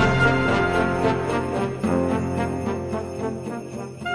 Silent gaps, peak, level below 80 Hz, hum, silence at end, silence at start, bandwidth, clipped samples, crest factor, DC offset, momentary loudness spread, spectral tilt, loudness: none; -4 dBFS; -40 dBFS; none; 0 s; 0 s; 11 kHz; under 0.1%; 18 dB; under 0.1%; 12 LU; -6.5 dB/octave; -23 LUFS